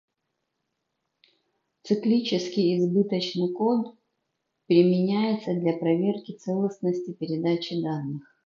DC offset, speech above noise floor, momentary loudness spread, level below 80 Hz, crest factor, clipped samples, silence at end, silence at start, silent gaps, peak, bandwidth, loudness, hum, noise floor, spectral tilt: under 0.1%; 56 dB; 9 LU; -76 dBFS; 20 dB; under 0.1%; 0.25 s; 1.85 s; none; -6 dBFS; 7.2 kHz; -25 LUFS; none; -80 dBFS; -7.5 dB/octave